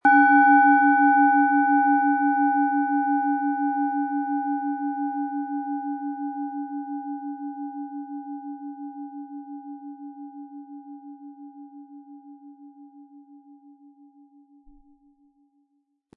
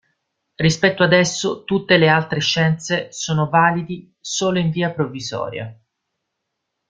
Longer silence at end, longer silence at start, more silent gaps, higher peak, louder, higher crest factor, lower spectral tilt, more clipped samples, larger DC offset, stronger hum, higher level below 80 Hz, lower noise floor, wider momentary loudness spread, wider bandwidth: first, 2.95 s vs 1.15 s; second, 0.05 s vs 0.6 s; neither; second, -6 dBFS vs -2 dBFS; second, -22 LUFS vs -18 LUFS; about the same, 18 dB vs 18 dB; first, -7 dB/octave vs -4.5 dB/octave; neither; neither; neither; second, -74 dBFS vs -56 dBFS; second, -72 dBFS vs -77 dBFS; first, 25 LU vs 12 LU; second, 3.5 kHz vs 9.2 kHz